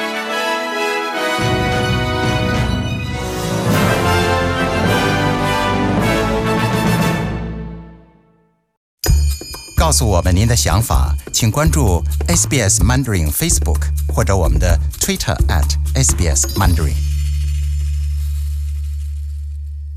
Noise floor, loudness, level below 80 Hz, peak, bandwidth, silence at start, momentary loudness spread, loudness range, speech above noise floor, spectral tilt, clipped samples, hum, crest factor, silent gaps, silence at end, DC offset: -57 dBFS; -16 LUFS; -22 dBFS; -4 dBFS; 16 kHz; 0 s; 9 LU; 5 LU; 43 dB; -4.5 dB/octave; under 0.1%; none; 12 dB; 8.77-8.98 s; 0 s; under 0.1%